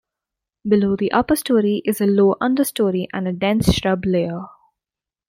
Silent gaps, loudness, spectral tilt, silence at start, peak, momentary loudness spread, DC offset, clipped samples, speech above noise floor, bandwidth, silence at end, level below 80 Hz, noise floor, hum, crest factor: none; -19 LUFS; -6 dB/octave; 0.65 s; -2 dBFS; 8 LU; under 0.1%; under 0.1%; 71 dB; 16.5 kHz; 0.8 s; -40 dBFS; -89 dBFS; none; 16 dB